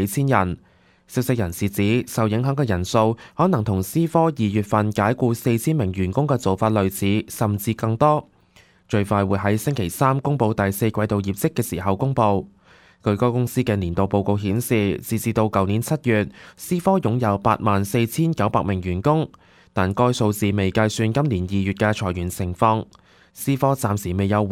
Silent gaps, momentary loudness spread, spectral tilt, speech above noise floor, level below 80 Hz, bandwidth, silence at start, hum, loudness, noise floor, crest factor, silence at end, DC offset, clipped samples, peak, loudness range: none; 5 LU; -6.5 dB/octave; 34 dB; -48 dBFS; 16.5 kHz; 0 s; none; -21 LUFS; -54 dBFS; 18 dB; 0 s; under 0.1%; under 0.1%; -2 dBFS; 2 LU